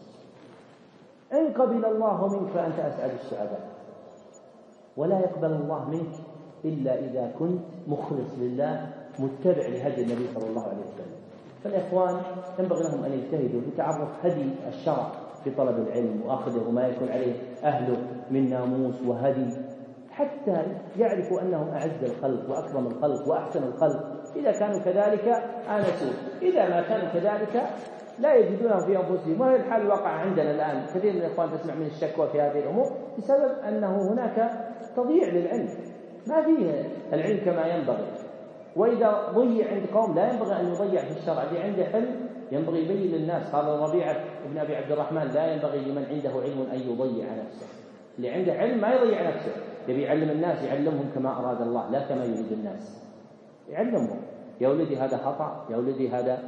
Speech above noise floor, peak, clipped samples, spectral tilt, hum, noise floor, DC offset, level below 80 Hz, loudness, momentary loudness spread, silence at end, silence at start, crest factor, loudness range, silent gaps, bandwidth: 27 dB; -8 dBFS; under 0.1%; -8 dB/octave; none; -53 dBFS; under 0.1%; -78 dBFS; -27 LUFS; 11 LU; 0 s; 0 s; 18 dB; 5 LU; none; 7.4 kHz